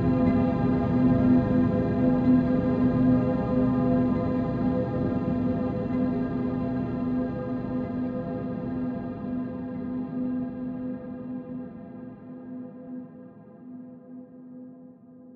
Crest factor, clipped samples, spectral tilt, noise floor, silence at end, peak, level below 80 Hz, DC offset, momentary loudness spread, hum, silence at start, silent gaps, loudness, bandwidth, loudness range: 16 dB; under 0.1%; -11 dB/octave; -48 dBFS; 0 s; -10 dBFS; -46 dBFS; under 0.1%; 22 LU; none; 0 s; none; -26 LUFS; 4.4 kHz; 17 LU